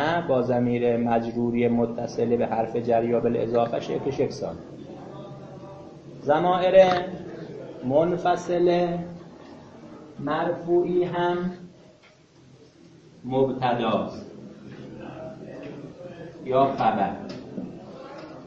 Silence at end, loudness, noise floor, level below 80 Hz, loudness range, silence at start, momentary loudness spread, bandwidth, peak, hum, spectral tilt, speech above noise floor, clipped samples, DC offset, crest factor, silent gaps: 0 s; -24 LUFS; -54 dBFS; -58 dBFS; 7 LU; 0 s; 20 LU; 7.6 kHz; -4 dBFS; none; -7 dB/octave; 31 dB; under 0.1%; under 0.1%; 20 dB; none